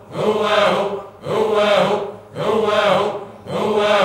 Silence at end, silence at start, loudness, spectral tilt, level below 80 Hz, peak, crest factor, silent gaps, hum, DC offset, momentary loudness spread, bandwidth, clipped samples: 0 s; 0.1 s; -18 LUFS; -4.5 dB/octave; -58 dBFS; -2 dBFS; 14 dB; none; none; under 0.1%; 11 LU; 15.5 kHz; under 0.1%